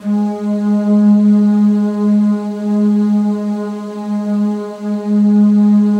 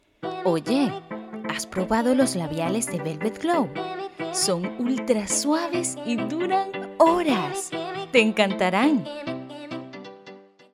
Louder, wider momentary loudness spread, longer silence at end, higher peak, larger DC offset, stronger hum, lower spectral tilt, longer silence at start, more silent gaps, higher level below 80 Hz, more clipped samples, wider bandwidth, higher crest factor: first, -14 LUFS vs -24 LUFS; second, 11 LU vs 14 LU; second, 0 s vs 0.3 s; about the same, -2 dBFS vs -4 dBFS; neither; neither; first, -9.5 dB/octave vs -4 dB/octave; second, 0 s vs 0.2 s; neither; second, -70 dBFS vs -60 dBFS; neither; second, 6.4 kHz vs 16.5 kHz; second, 10 dB vs 20 dB